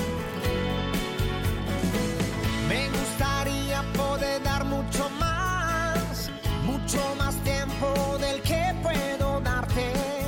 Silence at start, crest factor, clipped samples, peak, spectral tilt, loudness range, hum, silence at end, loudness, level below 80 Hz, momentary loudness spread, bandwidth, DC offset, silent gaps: 0 s; 12 dB; under 0.1%; -14 dBFS; -5 dB/octave; 1 LU; none; 0 s; -27 LUFS; -36 dBFS; 3 LU; 17 kHz; under 0.1%; none